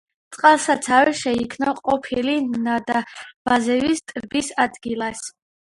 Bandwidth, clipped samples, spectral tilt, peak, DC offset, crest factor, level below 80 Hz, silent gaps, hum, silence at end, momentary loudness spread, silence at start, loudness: 11.5 kHz; under 0.1%; -3 dB/octave; 0 dBFS; under 0.1%; 20 dB; -56 dBFS; 3.36-3.45 s; none; 0.4 s; 10 LU; 0.3 s; -20 LUFS